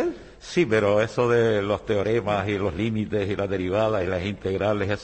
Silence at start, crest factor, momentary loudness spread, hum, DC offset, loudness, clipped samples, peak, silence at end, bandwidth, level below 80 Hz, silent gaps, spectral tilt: 0 s; 14 dB; 7 LU; none; under 0.1%; -24 LUFS; under 0.1%; -8 dBFS; 0 s; 8.8 kHz; -50 dBFS; none; -6.5 dB/octave